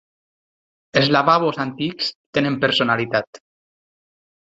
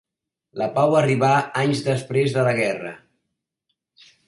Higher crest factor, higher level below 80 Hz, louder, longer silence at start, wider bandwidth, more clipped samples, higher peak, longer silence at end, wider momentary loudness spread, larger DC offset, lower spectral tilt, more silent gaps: about the same, 20 dB vs 16 dB; about the same, -60 dBFS vs -62 dBFS; about the same, -19 LUFS vs -20 LUFS; first, 0.95 s vs 0.55 s; second, 8 kHz vs 11.5 kHz; neither; first, -2 dBFS vs -6 dBFS; about the same, 1.2 s vs 1.3 s; about the same, 9 LU vs 11 LU; neither; about the same, -5.5 dB/octave vs -6 dB/octave; first, 2.15-2.33 s, 3.27-3.33 s vs none